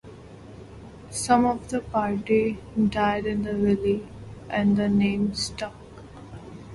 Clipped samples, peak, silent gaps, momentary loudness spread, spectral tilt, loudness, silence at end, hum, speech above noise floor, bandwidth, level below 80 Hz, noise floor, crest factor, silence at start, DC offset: under 0.1%; -6 dBFS; none; 23 LU; -5.5 dB/octave; -24 LUFS; 0 s; none; 20 dB; 11.5 kHz; -48 dBFS; -44 dBFS; 20 dB; 0.05 s; under 0.1%